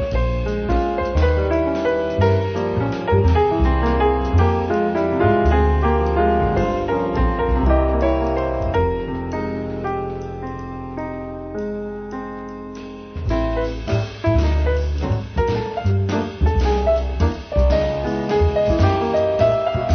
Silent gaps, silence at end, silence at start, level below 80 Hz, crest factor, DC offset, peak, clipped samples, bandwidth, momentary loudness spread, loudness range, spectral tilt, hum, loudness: none; 0 s; 0 s; -24 dBFS; 16 dB; under 0.1%; -4 dBFS; under 0.1%; 6.6 kHz; 12 LU; 9 LU; -8 dB/octave; none; -20 LUFS